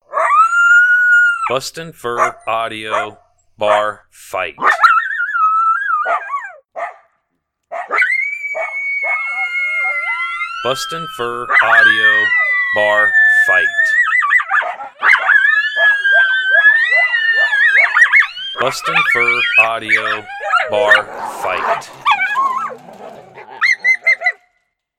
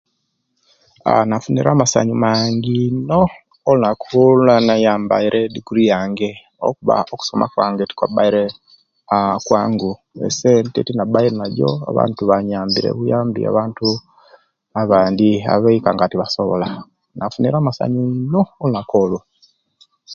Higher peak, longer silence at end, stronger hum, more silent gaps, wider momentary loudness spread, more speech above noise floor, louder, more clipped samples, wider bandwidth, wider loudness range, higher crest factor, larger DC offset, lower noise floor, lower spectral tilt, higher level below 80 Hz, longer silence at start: about the same, 0 dBFS vs 0 dBFS; first, 0.65 s vs 0 s; neither; neither; first, 13 LU vs 8 LU; about the same, 56 dB vs 54 dB; first, -12 LUFS vs -17 LUFS; neither; first, 15.5 kHz vs 7.8 kHz; first, 7 LU vs 4 LU; about the same, 14 dB vs 16 dB; neither; about the same, -71 dBFS vs -70 dBFS; second, -1.5 dB/octave vs -6 dB/octave; second, -60 dBFS vs -52 dBFS; second, 0.1 s vs 1.05 s